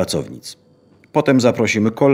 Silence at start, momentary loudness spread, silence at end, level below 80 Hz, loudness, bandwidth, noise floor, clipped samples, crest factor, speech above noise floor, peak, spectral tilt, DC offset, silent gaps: 0 s; 19 LU; 0 s; -54 dBFS; -17 LUFS; 16 kHz; -52 dBFS; under 0.1%; 16 dB; 36 dB; -2 dBFS; -5.5 dB/octave; under 0.1%; none